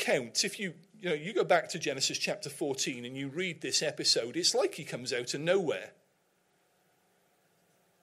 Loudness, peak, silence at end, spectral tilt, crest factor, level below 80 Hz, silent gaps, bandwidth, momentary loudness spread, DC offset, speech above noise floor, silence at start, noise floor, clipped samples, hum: -31 LUFS; -14 dBFS; 2.15 s; -2.5 dB/octave; 20 dB; -82 dBFS; none; 16 kHz; 11 LU; under 0.1%; 40 dB; 0 s; -72 dBFS; under 0.1%; none